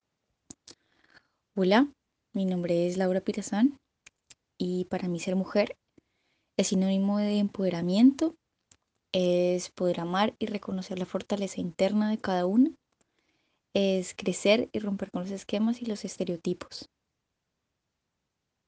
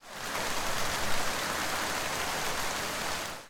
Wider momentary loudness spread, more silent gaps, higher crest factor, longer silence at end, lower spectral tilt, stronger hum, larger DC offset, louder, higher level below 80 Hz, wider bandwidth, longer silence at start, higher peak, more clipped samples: first, 10 LU vs 2 LU; neither; about the same, 18 dB vs 16 dB; first, 1.85 s vs 0 s; first, -6 dB/octave vs -1.5 dB/octave; neither; neither; first, -28 LUFS vs -31 LUFS; second, -68 dBFS vs -48 dBFS; second, 9.6 kHz vs 18.5 kHz; first, 1.55 s vs 0.05 s; first, -10 dBFS vs -16 dBFS; neither